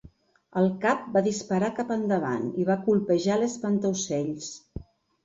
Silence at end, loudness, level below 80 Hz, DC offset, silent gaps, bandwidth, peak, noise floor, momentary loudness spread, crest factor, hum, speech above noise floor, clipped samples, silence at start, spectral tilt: 0.4 s; -26 LUFS; -56 dBFS; under 0.1%; none; 7.8 kHz; -10 dBFS; -55 dBFS; 12 LU; 16 dB; none; 29 dB; under 0.1%; 0.05 s; -5.5 dB/octave